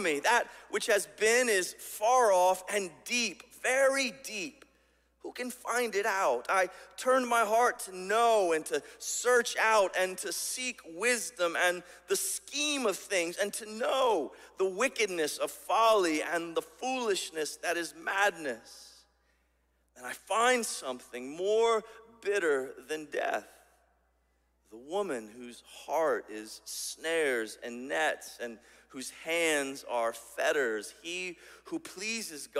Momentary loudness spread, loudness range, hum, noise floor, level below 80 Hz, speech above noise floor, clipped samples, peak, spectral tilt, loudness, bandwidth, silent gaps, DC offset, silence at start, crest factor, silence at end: 14 LU; 7 LU; none; -73 dBFS; -74 dBFS; 42 dB; under 0.1%; -12 dBFS; -1.5 dB/octave; -30 LUFS; 16 kHz; none; under 0.1%; 0 s; 18 dB; 0 s